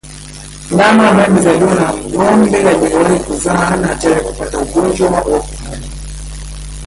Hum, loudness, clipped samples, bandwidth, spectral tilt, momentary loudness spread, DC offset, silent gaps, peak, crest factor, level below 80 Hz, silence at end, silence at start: 50 Hz at -30 dBFS; -11 LUFS; under 0.1%; 11.5 kHz; -5.5 dB/octave; 19 LU; under 0.1%; none; 0 dBFS; 12 dB; -30 dBFS; 0 s; 0.05 s